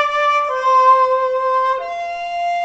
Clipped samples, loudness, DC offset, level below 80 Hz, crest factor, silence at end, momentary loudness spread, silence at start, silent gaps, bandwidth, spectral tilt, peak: under 0.1%; -16 LUFS; under 0.1%; -58 dBFS; 14 dB; 0 s; 12 LU; 0 s; none; 8 kHz; -0.5 dB/octave; -2 dBFS